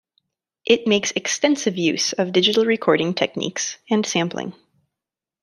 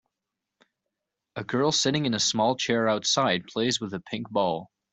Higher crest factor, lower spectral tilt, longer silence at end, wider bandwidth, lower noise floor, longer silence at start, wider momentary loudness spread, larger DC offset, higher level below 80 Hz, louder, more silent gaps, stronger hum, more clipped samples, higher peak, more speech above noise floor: about the same, 20 dB vs 18 dB; about the same, -3.5 dB/octave vs -3.5 dB/octave; first, 0.9 s vs 0.3 s; first, 13.5 kHz vs 8.2 kHz; about the same, -87 dBFS vs -86 dBFS; second, 0.65 s vs 1.35 s; about the same, 9 LU vs 11 LU; neither; about the same, -66 dBFS vs -66 dBFS; first, -20 LUFS vs -25 LUFS; neither; neither; neither; first, -2 dBFS vs -10 dBFS; first, 67 dB vs 60 dB